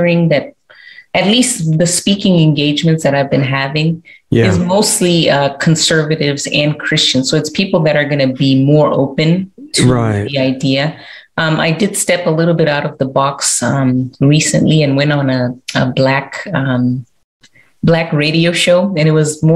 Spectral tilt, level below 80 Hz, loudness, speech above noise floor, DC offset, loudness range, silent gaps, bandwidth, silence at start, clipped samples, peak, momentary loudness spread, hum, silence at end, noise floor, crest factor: -4.5 dB/octave; -46 dBFS; -12 LUFS; 27 dB; under 0.1%; 2 LU; 17.24-17.40 s; 15.5 kHz; 0 s; under 0.1%; 0 dBFS; 6 LU; none; 0 s; -39 dBFS; 12 dB